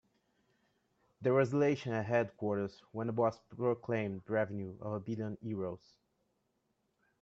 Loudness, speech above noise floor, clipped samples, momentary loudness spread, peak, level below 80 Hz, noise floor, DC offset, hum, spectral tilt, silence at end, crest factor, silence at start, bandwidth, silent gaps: -36 LUFS; 45 dB; under 0.1%; 10 LU; -18 dBFS; -76 dBFS; -80 dBFS; under 0.1%; none; -8 dB/octave; 1.45 s; 18 dB; 1.2 s; 8 kHz; none